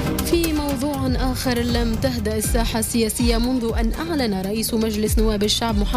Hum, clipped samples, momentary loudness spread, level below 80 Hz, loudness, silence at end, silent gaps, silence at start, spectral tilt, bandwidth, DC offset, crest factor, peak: none; under 0.1%; 3 LU; -26 dBFS; -21 LUFS; 0 s; none; 0 s; -4.5 dB/octave; 16 kHz; under 0.1%; 12 dB; -8 dBFS